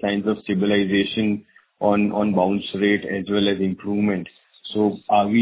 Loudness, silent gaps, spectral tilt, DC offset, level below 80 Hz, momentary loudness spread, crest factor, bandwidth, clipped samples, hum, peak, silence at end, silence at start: -21 LUFS; none; -10.5 dB/octave; under 0.1%; -54 dBFS; 6 LU; 16 dB; 4 kHz; under 0.1%; none; -4 dBFS; 0 s; 0 s